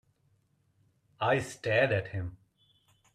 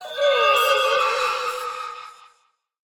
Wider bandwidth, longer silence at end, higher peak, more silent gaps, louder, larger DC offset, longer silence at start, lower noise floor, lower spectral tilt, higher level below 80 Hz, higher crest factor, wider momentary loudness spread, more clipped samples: second, 13.5 kHz vs 19.5 kHz; about the same, 0.8 s vs 0.85 s; second, -14 dBFS vs -6 dBFS; neither; second, -30 LUFS vs -20 LUFS; neither; first, 1.2 s vs 0 s; first, -71 dBFS vs -65 dBFS; first, -5.5 dB/octave vs 1 dB/octave; about the same, -64 dBFS vs -64 dBFS; about the same, 20 dB vs 16 dB; about the same, 13 LU vs 15 LU; neither